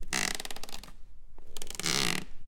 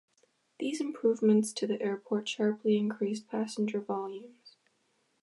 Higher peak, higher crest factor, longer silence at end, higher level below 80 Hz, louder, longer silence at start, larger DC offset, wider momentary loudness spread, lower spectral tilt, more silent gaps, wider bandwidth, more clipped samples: first, -6 dBFS vs -14 dBFS; first, 26 dB vs 18 dB; second, 0 s vs 0.75 s; first, -44 dBFS vs -84 dBFS; about the same, -32 LUFS vs -31 LUFS; second, 0 s vs 0.6 s; neither; first, 19 LU vs 10 LU; second, -1.5 dB/octave vs -5.5 dB/octave; neither; first, 17 kHz vs 11.5 kHz; neither